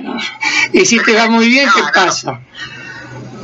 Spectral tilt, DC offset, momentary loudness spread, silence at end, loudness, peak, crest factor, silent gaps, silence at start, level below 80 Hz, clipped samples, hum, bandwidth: -2.5 dB/octave; under 0.1%; 20 LU; 0 s; -10 LUFS; 0 dBFS; 12 dB; none; 0 s; -54 dBFS; under 0.1%; none; 8.2 kHz